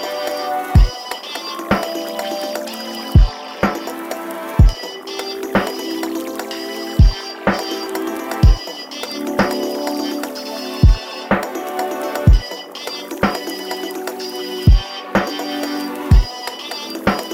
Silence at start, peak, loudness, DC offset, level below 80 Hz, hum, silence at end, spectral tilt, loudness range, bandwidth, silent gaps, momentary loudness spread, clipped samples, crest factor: 0 s; 0 dBFS; -20 LUFS; under 0.1%; -20 dBFS; none; 0 s; -5.5 dB/octave; 2 LU; 16.5 kHz; none; 11 LU; under 0.1%; 18 dB